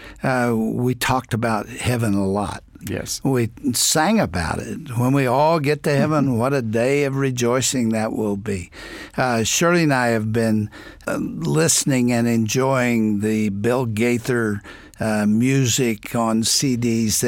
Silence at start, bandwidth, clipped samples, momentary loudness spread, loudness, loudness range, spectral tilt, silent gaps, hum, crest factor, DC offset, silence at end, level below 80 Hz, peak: 0 s; 17 kHz; under 0.1%; 9 LU; -20 LUFS; 2 LU; -4.5 dB/octave; none; none; 14 dB; under 0.1%; 0 s; -46 dBFS; -6 dBFS